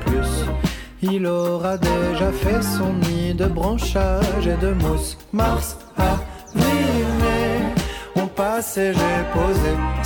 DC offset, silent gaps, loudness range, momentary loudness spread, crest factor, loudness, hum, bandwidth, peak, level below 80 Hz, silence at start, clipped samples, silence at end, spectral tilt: under 0.1%; none; 1 LU; 5 LU; 14 dB; -21 LUFS; none; 19 kHz; -6 dBFS; -26 dBFS; 0 s; under 0.1%; 0 s; -6 dB/octave